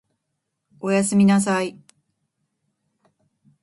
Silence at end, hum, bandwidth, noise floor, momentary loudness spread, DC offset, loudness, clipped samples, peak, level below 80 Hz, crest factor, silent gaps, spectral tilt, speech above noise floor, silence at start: 1.95 s; none; 11.5 kHz; -78 dBFS; 13 LU; under 0.1%; -20 LUFS; under 0.1%; -8 dBFS; -64 dBFS; 16 dB; none; -5.5 dB/octave; 60 dB; 0.85 s